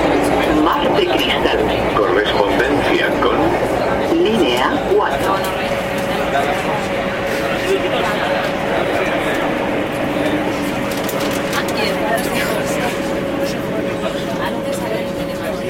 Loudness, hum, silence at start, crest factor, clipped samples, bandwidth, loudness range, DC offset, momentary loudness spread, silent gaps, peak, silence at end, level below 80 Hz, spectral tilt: -17 LUFS; none; 0 s; 16 dB; under 0.1%; 16.5 kHz; 4 LU; under 0.1%; 6 LU; none; 0 dBFS; 0 s; -38 dBFS; -5 dB/octave